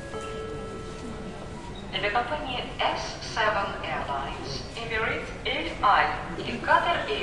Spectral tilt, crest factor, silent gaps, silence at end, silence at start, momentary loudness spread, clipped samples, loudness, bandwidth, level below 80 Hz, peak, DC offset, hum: -4 dB/octave; 22 dB; none; 0 s; 0 s; 15 LU; under 0.1%; -28 LUFS; 11.5 kHz; -44 dBFS; -8 dBFS; 0.3%; none